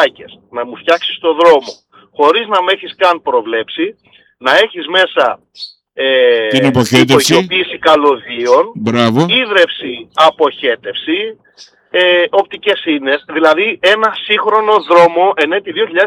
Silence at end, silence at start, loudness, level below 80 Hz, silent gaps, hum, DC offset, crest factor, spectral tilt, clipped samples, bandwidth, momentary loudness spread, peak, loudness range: 0 s; 0 s; -11 LUFS; -56 dBFS; none; none; under 0.1%; 12 dB; -4 dB/octave; under 0.1%; 15.5 kHz; 10 LU; 0 dBFS; 3 LU